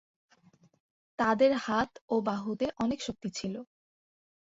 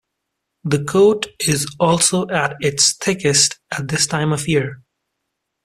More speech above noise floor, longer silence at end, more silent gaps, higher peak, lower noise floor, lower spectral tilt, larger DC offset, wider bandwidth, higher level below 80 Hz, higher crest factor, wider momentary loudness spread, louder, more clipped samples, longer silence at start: second, 34 dB vs 60 dB; about the same, 0.9 s vs 0.9 s; first, 2.01-2.08 s vs none; second, -14 dBFS vs -2 dBFS; second, -64 dBFS vs -77 dBFS; first, -5 dB/octave vs -3.5 dB/octave; neither; second, 8 kHz vs 15 kHz; second, -64 dBFS vs -52 dBFS; about the same, 18 dB vs 18 dB; first, 12 LU vs 8 LU; second, -31 LUFS vs -17 LUFS; neither; first, 1.2 s vs 0.65 s